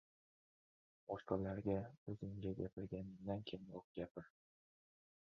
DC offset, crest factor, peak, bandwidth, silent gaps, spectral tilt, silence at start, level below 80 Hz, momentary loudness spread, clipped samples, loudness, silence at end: under 0.1%; 24 dB; -24 dBFS; 6.6 kHz; 1.98-2.06 s, 2.73-2.77 s, 3.84-3.95 s, 4.11-4.15 s; -7 dB/octave; 1.1 s; -68 dBFS; 10 LU; under 0.1%; -47 LUFS; 1 s